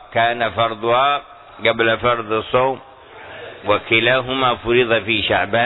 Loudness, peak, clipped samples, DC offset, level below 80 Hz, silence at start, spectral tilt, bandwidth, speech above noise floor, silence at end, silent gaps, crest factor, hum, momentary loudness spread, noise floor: -17 LUFS; -2 dBFS; under 0.1%; under 0.1%; -48 dBFS; 0 s; -8 dB/octave; 4.1 kHz; 21 dB; 0 s; none; 16 dB; none; 9 LU; -38 dBFS